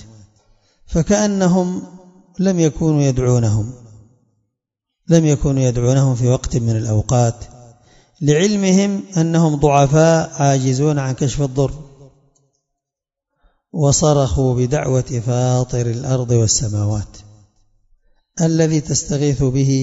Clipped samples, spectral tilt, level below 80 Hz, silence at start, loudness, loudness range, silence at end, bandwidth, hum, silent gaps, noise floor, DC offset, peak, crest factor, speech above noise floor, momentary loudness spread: under 0.1%; -6 dB/octave; -36 dBFS; 0 s; -16 LUFS; 5 LU; 0 s; 8 kHz; none; none; -85 dBFS; under 0.1%; 0 dBFS; 16 dB; 69 dB; 8 LU